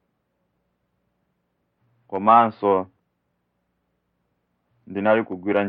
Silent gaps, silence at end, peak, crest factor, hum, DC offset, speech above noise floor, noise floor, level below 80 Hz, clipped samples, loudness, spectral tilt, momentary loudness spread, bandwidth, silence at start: none; 0 s; -2 dBFS; 22 dB; none; under 0.1%; 54 dB; -74 dBFS; -76 dBFS; under 0.1%; -20 LUFS; -10 dB/octave; 17 LU; 5 kHz; 2.1 s